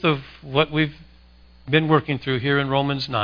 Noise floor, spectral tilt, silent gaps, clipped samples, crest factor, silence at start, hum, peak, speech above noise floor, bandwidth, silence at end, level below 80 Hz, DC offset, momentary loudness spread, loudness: -50 dBFS; -8 dB/octave; none; under 0.1%; 20 dB; 0 s; 60 Hz at -50 dBFS; -2 dBFS; 28 dB; 5.2 kHz; 0 s; -50 dBFS; under 0.1%; 6 LU; -22 LUFS